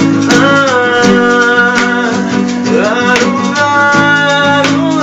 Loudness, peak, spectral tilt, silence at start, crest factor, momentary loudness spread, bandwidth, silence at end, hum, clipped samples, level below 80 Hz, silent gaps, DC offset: -9 LUFS; 0 dBFS; -4.5 dB/octave; 0 s; 8 dB; 5 LU; 10.5 kHz; 0 s; none; 0.4%; -44 dBFS; none; under 0.1%